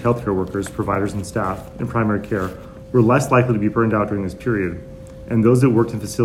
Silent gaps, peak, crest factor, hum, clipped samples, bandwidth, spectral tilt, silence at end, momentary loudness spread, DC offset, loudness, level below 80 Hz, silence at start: none; -2 dBFS; 18 dB; none; under 0.1%; 14.5 kHz; -7.5 dB/octave; 0 s; 12 LU; under 0.1%; -19 LUFS; -42 dBFS; 0 s